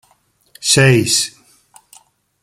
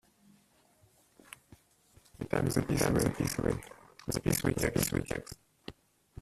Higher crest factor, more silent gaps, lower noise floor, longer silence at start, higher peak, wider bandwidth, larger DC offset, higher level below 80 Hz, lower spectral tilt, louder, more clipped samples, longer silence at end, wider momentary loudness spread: about the same, 18 dB vs 22 dB; neither; second, -58 dBFS vs -67 dBFS; second, 0.6 s vs 2.2 s; first, 0 dBFS vs -12 dBFS; about the same, 15.5 kHz vs 15.5 kHz; neither; about the same, -52 dBFS vs -50 dBFS; second, -3.5 dB/octave vs -5 dB/octave; first, -13 LUFS vs -32 LUFS; neither; first, 1.15 s vs 0.5 s; second, 12 LU vs 22 LU